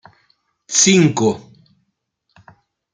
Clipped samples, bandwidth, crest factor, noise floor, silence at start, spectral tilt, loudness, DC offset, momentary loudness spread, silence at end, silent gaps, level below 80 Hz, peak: under 0.1%; 9.8 kHz; 18 dB; -70 dBFS; 0.7 s; -3.5 dB/octave; -14 LUFS; under 0.1%; 10 LU; 1.55 s; none; -60 dBFS; -2 dBFS